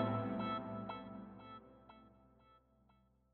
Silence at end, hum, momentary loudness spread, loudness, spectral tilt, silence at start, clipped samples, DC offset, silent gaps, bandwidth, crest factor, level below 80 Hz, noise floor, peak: 0.75 s; none; 22 LU; -44 LUFS; -6 dB/octave; 0 s; under 0.1%; under 0.1%; none; 4.3 kHz; 20 dB; -72 dBFS; -73 dBFS; -24 dBFS